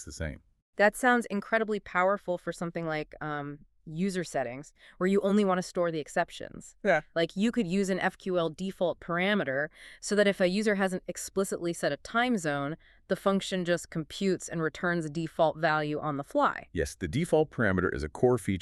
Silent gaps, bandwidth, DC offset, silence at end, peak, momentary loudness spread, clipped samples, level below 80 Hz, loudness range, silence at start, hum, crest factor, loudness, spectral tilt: 0.62-0.73 s; 13 kHz; under 0.1%; 0 s; -10 dBFS; 10 LU; under 0.1%; -54 dBFS; 2 LU; 0 s; none; 18 dB; -29 LUFS; -5.5 dB/octave